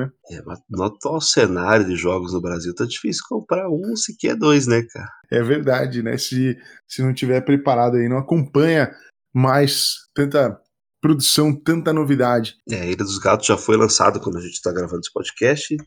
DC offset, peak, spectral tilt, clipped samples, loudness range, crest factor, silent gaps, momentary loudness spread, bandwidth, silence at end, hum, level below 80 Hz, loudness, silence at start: under 0.1%; 0 dBFS; -4.5 dB/octave; under 0.1%; 3 LU; 20 dB; none; 10 LU; over 20 kHz; 0.05 s; none; -54 dBFS; -19 LUFS; 0 s